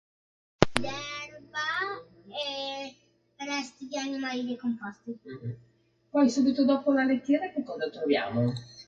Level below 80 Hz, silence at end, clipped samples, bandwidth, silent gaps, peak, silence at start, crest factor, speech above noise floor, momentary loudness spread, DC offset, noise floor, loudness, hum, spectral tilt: -60 dBFS; 0.05 s; under 0.1%; 11.5 kHz; none; 0 dBFS; 0.6 s; 30 dB; 32 dB; 16 LU; under 0.1%; -61 dBFS; -29 LUFS; none; -5.5 dB/octave